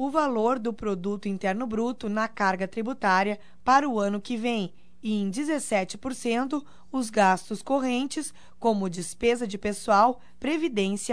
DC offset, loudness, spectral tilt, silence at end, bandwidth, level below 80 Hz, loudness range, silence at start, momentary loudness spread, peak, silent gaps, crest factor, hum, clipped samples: 0.7%; -27 LUFS; -4.5 dB/octave; 0 s; 11 kHz; -58 dBFS; 2 LU; 0 s; 9 LU; -6 dBFS; none; 20 dB; none; under 0.1%